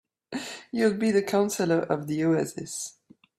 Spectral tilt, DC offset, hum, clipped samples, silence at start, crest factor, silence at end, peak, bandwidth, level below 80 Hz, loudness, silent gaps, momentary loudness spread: -5 dB/octave; under 0.1%; none; under 0.1%; 0.3 s; 18 dB; 0.5 s; -10 dBFS; 15.5 kHz; -68 dBFS; -27 LUFS; none; 12 LU